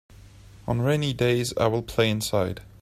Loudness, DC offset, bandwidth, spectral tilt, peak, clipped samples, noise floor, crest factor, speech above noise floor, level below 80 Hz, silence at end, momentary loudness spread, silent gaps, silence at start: -25 LUFS; under 0.1%; 15 kHz; -5.5 dB/octave; -8 dBFS; under 0.1%; -48 dBFS; 18 dB; 24 dB; -48 dBFS; 0.15 s; 6 LU; none; 0.45 s